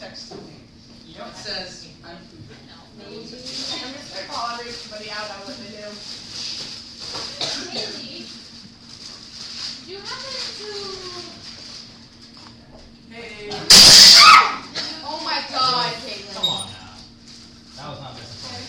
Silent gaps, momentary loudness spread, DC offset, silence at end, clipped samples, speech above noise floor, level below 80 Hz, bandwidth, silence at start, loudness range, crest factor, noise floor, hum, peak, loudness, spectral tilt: none; 28 LU; under 0.1%; 0 s; under 0.1%; 12 dB; -50 dBFS; 16 kHz; 0 s; 23 LU; 20 dB; -45 dBFS; none; 0 dBFS; -11 LUFS; 0 dB/octave